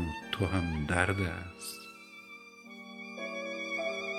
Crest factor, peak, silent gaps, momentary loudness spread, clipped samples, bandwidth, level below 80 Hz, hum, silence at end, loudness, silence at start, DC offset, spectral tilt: 26 dB; -10 dBFS; none; 19 LU; under 0.1%; 15 kHz; -50 dBFS; none; 0 s; -34 LUFS; 0 s; under 0.1%; -5 dB/octave